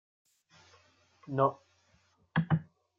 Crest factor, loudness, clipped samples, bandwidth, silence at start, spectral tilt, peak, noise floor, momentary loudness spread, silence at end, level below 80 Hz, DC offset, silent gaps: 22 dB; -32 LUFS; under 0.1%; 6.8 kHz; 1.3 s; -9 dB/octave; -14 dBFS; -70 dBFS; 8 LU; 0.35 s; -70 dBFS; under 0.1%; none